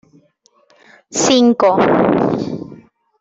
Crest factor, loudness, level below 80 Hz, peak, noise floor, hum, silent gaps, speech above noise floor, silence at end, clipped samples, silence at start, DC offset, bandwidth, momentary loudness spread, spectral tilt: 14 dB; -14 LUFS; -54 dBFS; -2 dBFS; -57 dBFS; none; none; 44 dB; 0.45 s; under 0.1%; 1.1 s; under 0.1%; 8 kHz; 15 LU; -4.5 dB/octave